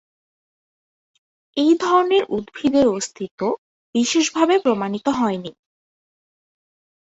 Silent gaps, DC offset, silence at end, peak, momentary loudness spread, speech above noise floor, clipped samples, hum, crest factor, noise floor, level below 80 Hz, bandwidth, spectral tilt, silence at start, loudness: 3.31-3.38 s, 3.58-3.93 s; under 0.1%; 1.7 s; -4 dBFS; 12 LU; over 71 dB; under 0.1%; none; 18 dB; under -90 dBFS; -60 dBFS; 8.2 kHz; -4 dB/octave; 1.55 s; -20 LUFS